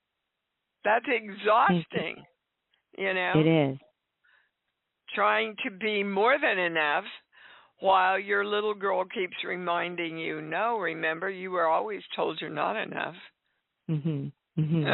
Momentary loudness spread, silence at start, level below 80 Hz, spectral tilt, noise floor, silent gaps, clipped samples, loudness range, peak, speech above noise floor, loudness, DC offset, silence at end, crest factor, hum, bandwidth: 11 LU; 0.85 s; -72 dBFS; -3.5 dB/octave; -83 dBFS; none; under 0.1%; 4 LU; -10 dBFS; 56 dB; -28 LUFS; under 0.1%; 0 s; 20 dB; none; 4.2 kHz